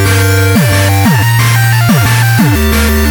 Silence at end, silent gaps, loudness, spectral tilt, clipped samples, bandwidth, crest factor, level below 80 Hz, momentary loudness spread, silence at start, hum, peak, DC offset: 0 s; none; -8 LUFS; -5 dB/octave; under 0.1%; over 20 kHz; 8 dB; -20 dBFS; 1 LU; 0 s; none; 0 dBFS; under 0.1%